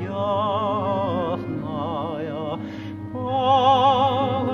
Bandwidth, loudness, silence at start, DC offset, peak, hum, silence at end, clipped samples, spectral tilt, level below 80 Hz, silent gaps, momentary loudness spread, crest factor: 7.2 kHz; -22 LUFS; 0 s; under 0.1%; -6 dBFS; none; 0 s; under 0.1%; -7.5 dB/octave; -56 dBFS; none; 13 LU; 16 dB